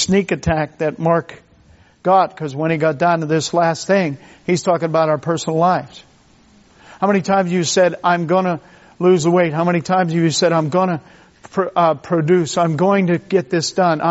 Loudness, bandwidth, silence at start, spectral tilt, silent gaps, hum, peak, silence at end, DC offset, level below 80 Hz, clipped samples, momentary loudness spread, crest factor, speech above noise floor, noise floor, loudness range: -17 LUFS; 8 kHz; 0 s; -5 dB/octave; none; none; -2 dBFS; 0 s; under 0.1%; -50 dBFS; under 0.1%; 7 LU; 14 dB; 34 dB; -50 dBFS; 2 LU